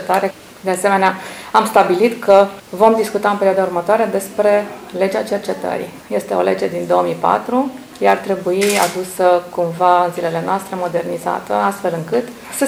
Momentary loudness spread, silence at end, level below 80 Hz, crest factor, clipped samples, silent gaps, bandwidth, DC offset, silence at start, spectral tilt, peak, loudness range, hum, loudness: 9 LU; 0 s; -58 dBFS; 16 dB; 0.1%; none; over 20 kHz; under 0.1%; 0 s; -4.5 dB/octave; 0 dBFS; 4 LU; none; -16 LUFS